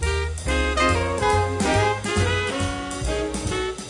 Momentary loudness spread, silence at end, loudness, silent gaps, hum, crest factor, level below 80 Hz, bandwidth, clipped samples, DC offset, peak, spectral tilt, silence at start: 6 LU; 0 s; -23 LUFS; none; none; 16 dB; -32 dBFS; 11.5 kHz; under 0.1%; under 0.1%; -6 dBFS; -4.5 dB/octave; 0 s